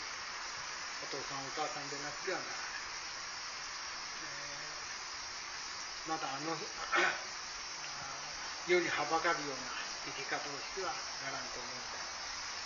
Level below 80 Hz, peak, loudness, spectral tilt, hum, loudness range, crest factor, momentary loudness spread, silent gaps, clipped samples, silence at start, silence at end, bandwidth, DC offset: -68 dBFS; -18 dBFS; -38 LUFS; -0.5 dB/octave; none; 6 LU; 22 dB; 9 LU; none; under 0.1%; 0 s; 0 s; 7.2 kHz; under 0.1%